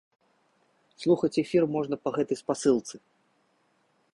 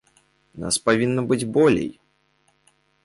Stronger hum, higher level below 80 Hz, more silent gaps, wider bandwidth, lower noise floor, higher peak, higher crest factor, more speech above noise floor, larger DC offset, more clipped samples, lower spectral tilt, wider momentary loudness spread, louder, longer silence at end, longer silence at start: neither; second, -68 dBFS vs -54 dBFS; neither; about the same, 11.5 kHz vs 11.5 kHz; first, -70 dBFS vs -65 dBFS; second, -10 dBFS vs -6 dBFS; about the same, 18 dB vs 18 dB; about the same, 43 dB vs 45 dB; neither; neither; first, -6 dB/octave vs -4.5 dB/octave; second, 7 LU vs 11 LU; second, -27 LUFS vs -21 LUFS; about the same, 1.15 s vs 1.15 s; first, 1 s vs 0.55 s